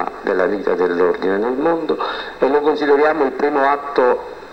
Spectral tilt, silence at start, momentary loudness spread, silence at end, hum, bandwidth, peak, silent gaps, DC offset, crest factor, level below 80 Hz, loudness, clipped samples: -6 dB/octave; 0 s; 6 LU; 0 s; none; 8 kHz; -2 dBFS; none; 0.4%; 16 dB; -52 dBFS; -17 LUFS; under 0.1%